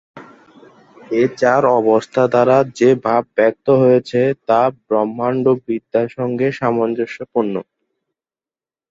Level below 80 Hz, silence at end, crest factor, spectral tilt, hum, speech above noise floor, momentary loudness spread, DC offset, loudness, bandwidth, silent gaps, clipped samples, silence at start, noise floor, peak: -60 dBFS; 1.3 s; 16 dB; -7.5 dB/octave; none; over 75 dB; 7 LU; under 0.1%; -16 LUFS; 7.8 kHz; none; under 0.1%; 0.15 s; under -90 dBFS; -2 dBFS